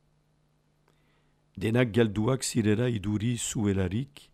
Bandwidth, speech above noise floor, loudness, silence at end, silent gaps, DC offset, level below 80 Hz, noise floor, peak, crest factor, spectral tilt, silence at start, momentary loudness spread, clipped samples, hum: 15 kHz; 42 dB; -28 LUFS; 0.3 s; none; under 0.1%; -56 dBFS; -69 dBFS; -12 dBFS; 18 dB; -5.5 dB/octave; 1.55 s; 5 LU; under 0.1%; none